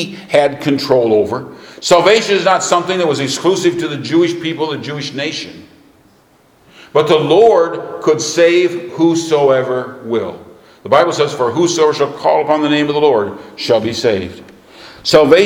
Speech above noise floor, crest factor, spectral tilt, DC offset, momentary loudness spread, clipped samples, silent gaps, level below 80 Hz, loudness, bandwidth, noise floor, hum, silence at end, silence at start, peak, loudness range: 37 dB; 14 dB; -4.5 dB/octave; under 0.1%; 11 LU; under 0.1%; none; -54 dBFS; -14 LUFS; 16 kHz; -50 dBFS; none; 0 s; 0 s; 0 dBFS; 5 LU